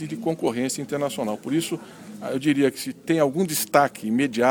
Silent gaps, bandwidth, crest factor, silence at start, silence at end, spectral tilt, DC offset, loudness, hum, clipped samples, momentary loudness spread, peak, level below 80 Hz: none; 19.5 kHz; 22 dB; 0 s; 0 s; -4.5 dB/octave; under 0.1%; -24 LUFS; none; under 0.1%; 10 LU; -2 dBFS; -66 dBFS